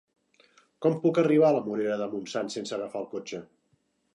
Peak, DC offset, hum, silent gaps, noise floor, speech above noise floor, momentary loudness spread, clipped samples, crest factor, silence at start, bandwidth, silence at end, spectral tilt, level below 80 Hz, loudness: -10 dBFS; under 0.1%; none; none; -72 dBFS; 45 dB; 15 LU; under 0.1%; 18 dB; 0.8 s; 11 kHz; 0.7 s; -6.5 dB/octave; -78 dBFS; -27 LUFS